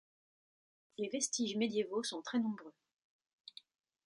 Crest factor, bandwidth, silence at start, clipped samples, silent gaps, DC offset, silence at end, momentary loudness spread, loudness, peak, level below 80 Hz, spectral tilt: 20 dB; 11 kHz; 1 s; under 0.1%; none; under 0.1%; 1.35 s; 20 LU; -37 LUFS; -22 dBFS; -86 dBFS; -3 dB/octave